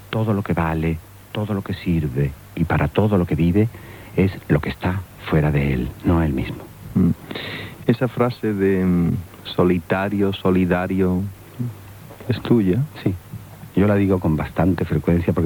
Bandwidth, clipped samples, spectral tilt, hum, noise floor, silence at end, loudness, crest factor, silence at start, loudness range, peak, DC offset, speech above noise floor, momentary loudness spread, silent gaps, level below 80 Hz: 19.5 kHz; under 0.1%; -8.5 dB/octave; none; -39 dBFS; 0 s; -21 LUFS; 16 dB; 0 s; 2 LU; -4 dBFS; under 0.1%; 20 dB; 12 LU; none; -38 dBFS